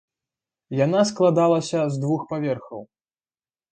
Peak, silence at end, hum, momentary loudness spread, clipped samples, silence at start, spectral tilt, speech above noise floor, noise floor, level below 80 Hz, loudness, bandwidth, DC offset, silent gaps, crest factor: -6 dBFS; 0.9 s; none; 12 LU; under 0.1%; 0.7 s; -6.5 dB/octave; over 69 dB; under -90 dBFS; -66 dBFS; -22 LUFS; 9.4 kHz; under 0.1%; none; 18 dB